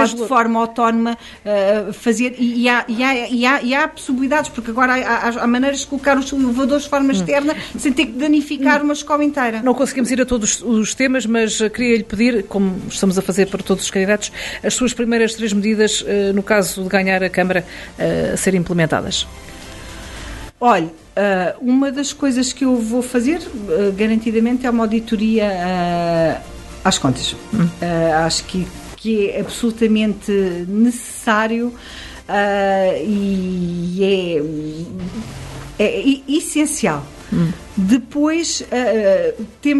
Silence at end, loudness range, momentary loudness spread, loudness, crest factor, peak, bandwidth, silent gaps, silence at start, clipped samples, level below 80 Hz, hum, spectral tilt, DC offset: 0 s; 3 LU; 7 LU; -17 LUFS; 16 dB; -2 dBFS; 12 kHz; none; 0 s; under 0.1%; -42 dBFS; none; -4.5 dB/octave; under 0.1%